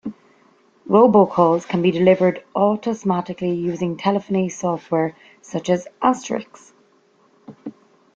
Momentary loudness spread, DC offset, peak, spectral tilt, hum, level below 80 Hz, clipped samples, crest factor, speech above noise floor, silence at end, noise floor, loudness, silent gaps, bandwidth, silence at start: 14 LU; under 0.1%; -2 dBFS; -7 dB/octave; none; -62 dBFS; under 0.1%; 18 dB; 39 dB; 0.45 s; -58 dBFS; -19 LUFS; none; 7.8 kHz; 0.05 s